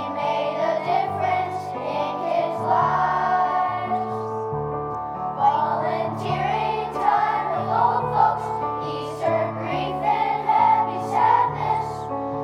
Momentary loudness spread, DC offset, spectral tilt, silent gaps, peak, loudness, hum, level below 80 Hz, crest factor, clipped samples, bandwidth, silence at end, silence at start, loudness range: 9 LU; under 0.1%; -6.5 dB/octave; none; -6 dBFS; -23 LUFS; none; -54 dBFS; 16 dB; under 0.1%; 11.5 kHz; 0 s; 0 s; 2 LU